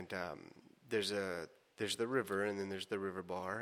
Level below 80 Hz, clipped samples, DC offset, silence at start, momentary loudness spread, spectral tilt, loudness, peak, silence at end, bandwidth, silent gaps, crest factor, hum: -78 dBFS; under 0.1%; under 0.1%; 0 s; 10 LU; -4 dB/octave; -40 LUFS; -22 dBFS; 0 s; 16 kHz; none; 18 dB; none